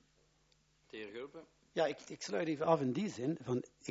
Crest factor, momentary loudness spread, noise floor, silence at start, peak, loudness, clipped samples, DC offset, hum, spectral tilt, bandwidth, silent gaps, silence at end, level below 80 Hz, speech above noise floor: 22 dB; 17 LU; -73 dBFS; 0.95 s; -18 dBFS; -38 LUFS; under 0.1%; under 0.1%; none; -5.5 dB/octave; 7.6 kHz; none; 0 s; -76 dBFS; 35 dB